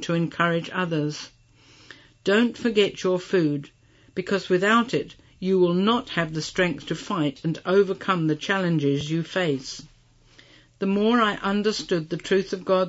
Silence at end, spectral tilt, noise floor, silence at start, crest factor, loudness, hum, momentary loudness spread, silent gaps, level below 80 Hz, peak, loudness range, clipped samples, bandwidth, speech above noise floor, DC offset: 0 s; -5.5 dB/octave; -55 dBFS; 0 s; 16 dB; -24 LUFS; none; 10 LU; none; -58 dBFS; -8 dBFS; 2 LU; under 0.1%; 8 kHz; 31 dB; under 0.1%